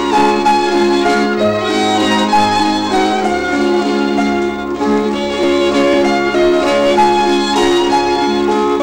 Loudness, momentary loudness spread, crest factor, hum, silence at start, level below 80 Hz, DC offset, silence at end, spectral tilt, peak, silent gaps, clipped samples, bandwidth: -13 LUFS; 4 LU; 10 dB; none; 0 s; -40 dBFS; under 0.1%; 0 s; -4.5 dB/octave; -4 dBFS; none; under 0.1%; 16 kHz